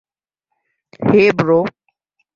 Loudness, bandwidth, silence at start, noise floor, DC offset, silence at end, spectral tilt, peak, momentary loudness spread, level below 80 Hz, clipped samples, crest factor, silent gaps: -15 LUFS; 7.2 kHz; 1 s; -77 dBFS; under 0.1%; 0.65 s; -7.5 dB/octave; -2 dBFS; 10 LU; -54 dBFS; under 0.1%; 16 dB; none